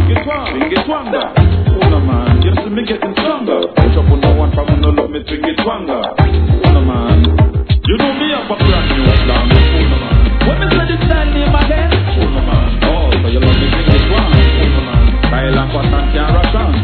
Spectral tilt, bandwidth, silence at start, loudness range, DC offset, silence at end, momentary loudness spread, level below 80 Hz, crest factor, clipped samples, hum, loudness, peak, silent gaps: -10 dB/octave; 4.6 kHz; 0 s; 2 LU; 0.3%; 0 s; 5 LU; -14 dBFS; 10 dB; 0.3%; none; -12 LUFS; 0 dBFS; none